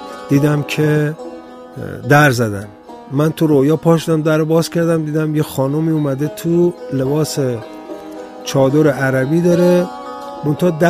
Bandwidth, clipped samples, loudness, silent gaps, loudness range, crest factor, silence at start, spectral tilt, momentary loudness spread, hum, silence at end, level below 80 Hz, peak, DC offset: 15.5 kHz; under 0.1%; -15 LUFS; none; 3 LU; 16 dB; 0 s; -6.5 dB/octave; 17 LU; none; 0 s; -52 dBFS; 0 dBFS; under 0.1%